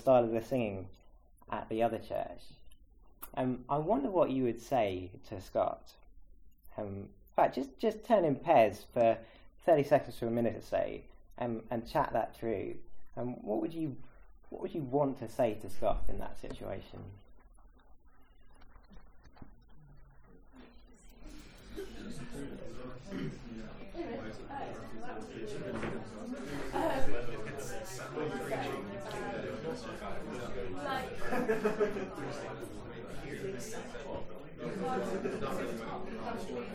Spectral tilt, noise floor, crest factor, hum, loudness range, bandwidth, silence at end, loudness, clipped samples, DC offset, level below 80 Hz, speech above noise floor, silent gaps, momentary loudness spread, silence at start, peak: -6.5 dB/octave; -58 dBFS; 22 dB; none; 14 LU; 18 kHz; 0 s; -36 LUFS; under 0.1%; under 0.1%; -52 dBFS; 25 dB; none; 16 LU; 0 s; -14 dBFS